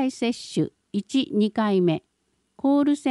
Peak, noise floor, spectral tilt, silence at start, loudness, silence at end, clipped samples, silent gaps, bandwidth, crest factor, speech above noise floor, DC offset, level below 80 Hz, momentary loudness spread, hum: -12 dBFS; -72 dBFS; -6 dB/octave; 0 s; -24 LUFS; 0 s; under 0.1%; none; 11.5 kHz; 12 dB; 49 dB; under 0.1%; -68 dBFS; 7 LU; none